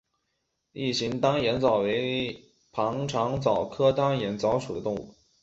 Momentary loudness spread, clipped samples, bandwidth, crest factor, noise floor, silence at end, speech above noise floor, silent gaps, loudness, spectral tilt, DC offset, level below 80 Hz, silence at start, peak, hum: 10 LU; under 0.1%; 8 kHz; 18 dB; -78 dBFS; 0.3 s; 52 dB; none; -27 LUFS; -5.5 dB/octave; under 0.1%; -56 dBFS; 0.75 s; -8 dBFS; none